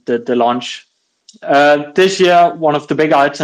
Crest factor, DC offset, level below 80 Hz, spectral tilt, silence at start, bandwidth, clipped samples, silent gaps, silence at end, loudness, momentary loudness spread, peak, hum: 12 dB; under 0.1%; -62 dBFS; -4.5 dB/octave; 0.1 s; 12 kHz; under 0.1%; none; 0 s; -12 LUFS; 13 LU; 0 dBFS; none